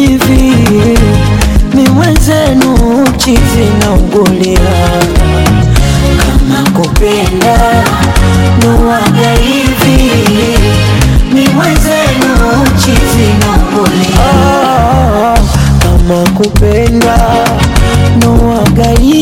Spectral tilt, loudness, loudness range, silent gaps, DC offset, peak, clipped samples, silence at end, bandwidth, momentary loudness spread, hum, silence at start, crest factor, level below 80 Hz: -5.5 dB/octave; -7 LUFS; 1 LU; none; under 0.1%; 0 dBFS; 0.2%; 0 s; 17.5 kHz; 2 LU; none; 0 s; 6 dB; -12 dBFS